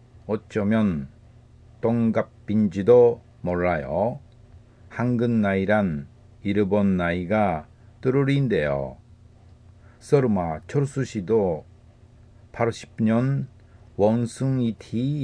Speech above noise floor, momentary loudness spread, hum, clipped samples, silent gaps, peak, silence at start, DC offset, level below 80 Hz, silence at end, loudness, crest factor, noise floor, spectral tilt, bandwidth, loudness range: 29 dB; 11 LU; none; under 0.1%; none; -6 dBFS; 0.25 s; under 0.1%; -50 dBFS; 0 s; -23 LUFS; 18 dB; -51 dBFS; -8 dB/octave; 10 kHz; 4 LU